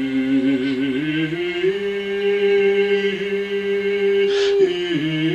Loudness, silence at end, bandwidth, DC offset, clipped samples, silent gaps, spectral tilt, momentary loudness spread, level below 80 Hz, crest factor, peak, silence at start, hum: -19 LUFS; 0 s; 8.4 kHz; under 0.1%; under 0.1%; none; -6 dB/octave; 6 LU; -56 dBFS; 12 dB; -6 dBFS; 0 s; none